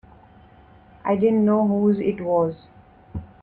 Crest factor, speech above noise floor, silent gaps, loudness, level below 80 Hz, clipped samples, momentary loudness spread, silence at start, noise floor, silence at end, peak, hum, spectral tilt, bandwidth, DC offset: 14 dB; 30 dB; none; -21 LUFS; -52 dBFS; under 0.1%; 19 LU; 1.05 s; -50 dBFS; 0.2 s; -8 dBFS; none; -11 dB/octave; 4.1 kHz; under 0.1%